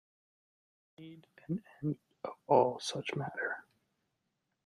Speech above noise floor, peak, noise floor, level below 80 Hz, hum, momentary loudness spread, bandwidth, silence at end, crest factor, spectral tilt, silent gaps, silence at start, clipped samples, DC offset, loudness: 49 dB; -12 dBFS; -84 dBFS; -78 dBFS; none; 25 LU; 12.5 kHz; 1.05 s; 26 dB; -5.5 dB/octave; none; 1 s; under 0.1%; under 0.1%; -35 LUFS